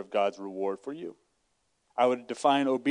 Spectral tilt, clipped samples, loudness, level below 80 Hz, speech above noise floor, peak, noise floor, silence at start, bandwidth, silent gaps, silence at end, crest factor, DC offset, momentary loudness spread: -4.5 dB/octave; under 0.1%; -29 LUFS; -84 dBFS; 47 dB; -10 dBFS; -75 dBFS; 0 s; 11 kHz; none; 0 s; 20 dB; under 0.1%; 14 LU